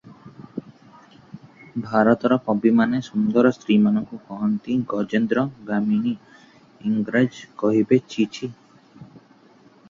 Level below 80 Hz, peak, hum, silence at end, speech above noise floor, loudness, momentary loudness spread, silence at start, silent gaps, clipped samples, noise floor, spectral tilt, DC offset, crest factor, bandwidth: -62 dBFS; -2 dBFS; none; 0.85 s; 32 dB; -21 LUFS; 16 LU; 0.05 s; none; under 0.1%; -53 dBFS; -7.5 dB/octave; under 0.1%; 20 dB; 7.4 kHz